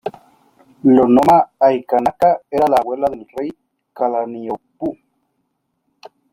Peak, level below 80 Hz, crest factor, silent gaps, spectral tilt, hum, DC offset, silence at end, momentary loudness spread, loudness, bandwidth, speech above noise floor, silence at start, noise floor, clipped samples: -2 dBFS; -54 dBFS; 16 dB; none; -7.5 dB/octave; none; under 0.1%; 1.4 s; 16 LU; -16 LUFS; 16 kHz; 55 dB; 0.05 s; -70 dBFS; under 0.1%